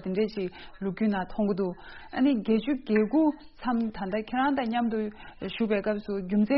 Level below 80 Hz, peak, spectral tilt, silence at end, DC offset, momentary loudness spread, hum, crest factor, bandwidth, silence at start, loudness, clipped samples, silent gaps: -54 dBFS; -12 dBFS; -5.5 dB/octave; 0 s; under 0.1%; 11 LU; none; 16 dB; 5.8 kHz; 0 s; -28 LUFS; under 0.1%; none